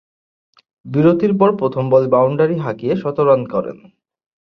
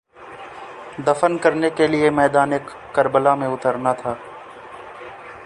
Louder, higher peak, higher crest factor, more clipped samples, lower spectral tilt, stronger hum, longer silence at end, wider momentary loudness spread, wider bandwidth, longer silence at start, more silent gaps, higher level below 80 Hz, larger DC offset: first, -16 LUFS vs -19 LUFS; about the same, -2 dBFS vs -2 dBFS; about the same, 16 dB vs 20 dB; neither; first, -10.5 dB/octave vs -6 dB/octave; neither; first, 0.65 s vs 0 s; second, 9 LU vs 21 LU; second, 5.8 kHz vs 11 kHz; first, 0.85 s vs 0.2 s; neither; about the same, -56 dBFS vs -56 dBFS; neither